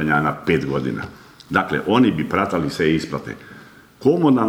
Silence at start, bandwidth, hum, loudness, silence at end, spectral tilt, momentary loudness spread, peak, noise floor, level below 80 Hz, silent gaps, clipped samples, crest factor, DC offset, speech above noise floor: 0 s; 15.5 kHz; none; -20 LUFS; 0 s; -7 dB/octave; 13 LU; -2 dBFS; -44 dBFS; -48 dBFS; none; under 0.1%; 18 dB; under 0.1%; 25 dB